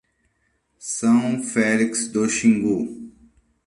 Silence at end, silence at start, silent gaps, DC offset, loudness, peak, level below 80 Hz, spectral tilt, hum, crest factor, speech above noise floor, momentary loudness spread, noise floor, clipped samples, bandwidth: 0.55 s; 0.8 s; none; under 0.1%; -21 LUFS; -4 dBFS; -60 dBFS; -4.5 dB/octave; none; 18 dB; 49 dB; 12 LU; -69 dBFS; under 0.1%; 11.5 kHz